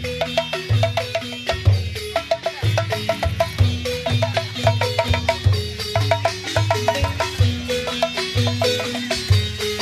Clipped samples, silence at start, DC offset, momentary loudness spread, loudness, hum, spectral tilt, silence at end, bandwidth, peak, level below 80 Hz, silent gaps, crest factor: under 0.1%; 0 s; under 0.1%; 4 LU; -21 LUFS; none; -5 dB/octave; 0 s; 14 kHz; -2 dBFS; -36 dBFS; none; 18 dB